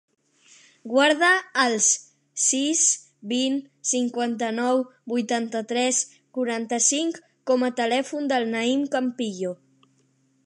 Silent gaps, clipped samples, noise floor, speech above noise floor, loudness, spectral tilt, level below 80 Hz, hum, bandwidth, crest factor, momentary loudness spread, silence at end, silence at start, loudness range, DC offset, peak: none; under 0.1%; -65 dBFS; 42 dB; -23 LUFS; -1.5 dB/octave; -82 dBFS; none; 11.5 kHz; 20 dB; 10 LU; 0.9 s; 0.85 s; 4 LU; under 0.1%; -4 dBFS